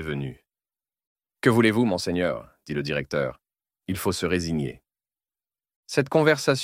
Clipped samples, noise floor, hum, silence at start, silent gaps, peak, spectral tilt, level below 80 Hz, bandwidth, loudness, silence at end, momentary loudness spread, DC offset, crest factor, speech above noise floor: under 0.1%; under -90 dBFS; none; 0 s; 1.07-1.16 s, 5.76-5.83 s; -6 dBFS; -5.5 dB/octave; -54 dBFS; 16.5 kHz; -25 LUFS; 0 s; 13 LU; under 0.1%; 20 dB; over 66 dB